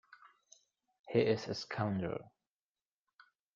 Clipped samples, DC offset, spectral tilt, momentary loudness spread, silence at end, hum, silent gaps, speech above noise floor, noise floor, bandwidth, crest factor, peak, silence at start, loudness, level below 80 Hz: under 0.1%; under 0.1%; -5.5 dB/octave; 9 LU; 1.3 s; none; 0.99-1.04 s; over 55 dB; under -90 dBFS; 7.4 kHz; 22 dB; -18 dBFS; 0.1 s; -36 LUFS; -72 dBFS